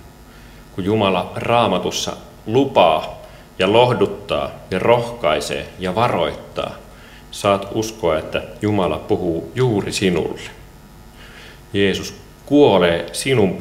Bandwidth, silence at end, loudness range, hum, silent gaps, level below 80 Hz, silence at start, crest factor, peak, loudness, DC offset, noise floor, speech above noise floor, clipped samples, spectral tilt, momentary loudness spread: 16 kHz; 0 s; 4 LU; none; none; -44 dBFS; 0.05 s; 18 dB; 0 dBFS; -18 LUFS; under 0.1%; -42 dBFS; 24 dB; under 0.1%; -5 dB/octave; 18 LU